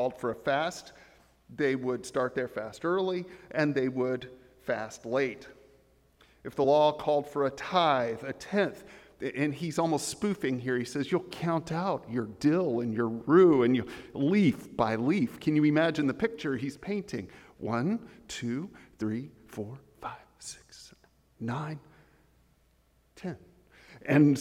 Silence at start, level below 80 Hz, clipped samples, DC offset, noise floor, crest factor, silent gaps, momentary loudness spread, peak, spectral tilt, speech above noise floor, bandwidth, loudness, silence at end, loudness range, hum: 0 s; -64 dBFS; under 0.1%; under 0.1%; -67 dBFS; 20 dB; none; 18 LU; -10 dBFS; -6 dB/octave; 38 dB; 15 kHz; -29 LUFS; 0 s; 14 LU; none